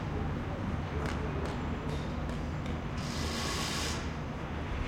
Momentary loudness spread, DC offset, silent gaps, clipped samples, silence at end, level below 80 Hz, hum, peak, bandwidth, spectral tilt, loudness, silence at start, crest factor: 4 LU; under 0.1%; none; under 0.1%; 0 s; -42 dBFS; none; -20 dBFS; 16.5 kHz; -5 dB/octave; -35 LUFS; 0 s; 16 dB